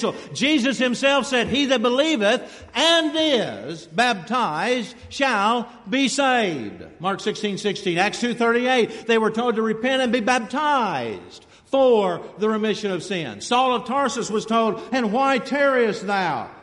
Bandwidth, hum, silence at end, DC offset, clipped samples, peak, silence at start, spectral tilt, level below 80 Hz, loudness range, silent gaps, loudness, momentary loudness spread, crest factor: 11.5 kHz; none; 0 s; under 0.1%; under 0.1%; -6 dBFS; 0 s; -3.5 dB/octave; -60 dBFS; 3 LU; none; -21 LUFS; 7 LU; 16 dB